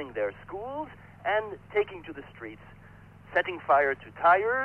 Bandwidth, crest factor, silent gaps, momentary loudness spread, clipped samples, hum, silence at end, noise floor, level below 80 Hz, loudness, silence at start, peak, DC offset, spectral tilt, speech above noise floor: 5.2 kHz; 18 dB; none; 20 LU; under 0.1%; none; 0 s; -51 dBFS; -60 dBFS; -28 LUFS; 0 s; -12 dBFS; under 0.1%; -6.5 dB/octave; 23 dB